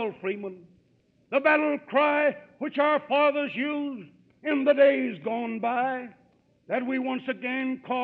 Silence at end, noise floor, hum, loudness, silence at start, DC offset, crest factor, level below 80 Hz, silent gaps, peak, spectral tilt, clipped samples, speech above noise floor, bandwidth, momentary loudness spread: 0 s; -65 dBFS; none; -26 LUFS; 0 s; under 0.1%; 18 dB; -78 dBFS; none; -8 dBFS; -7.5 dB/octave; under 0.1%; 39 dB; 4.6 kHz; 14 LU